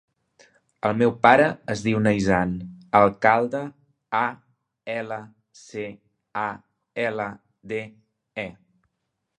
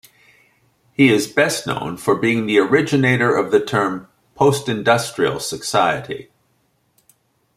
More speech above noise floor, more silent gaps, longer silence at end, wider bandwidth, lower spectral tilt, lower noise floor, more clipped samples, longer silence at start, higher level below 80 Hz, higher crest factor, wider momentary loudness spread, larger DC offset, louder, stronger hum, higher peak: first, 56 dB vs 46 dB; neither; second, 0.85 s vs 1.35 s; second, 10.5 kHz vs 16 kHz; first, -6.5 dB/octave vs -5 dB/octave; first, -79 dBFS vs -64 dBFS; neither; second, 0.85 s vs 1 s; about the same, -54 dBFS vs -58 dBFS; first, 24 dB vs 18 dB; first, 19 LU vs 9 LU; neither; second, -23 LUFS vs -17 LUFS; neither; about the same, 0 dBFS vs -2 dBFS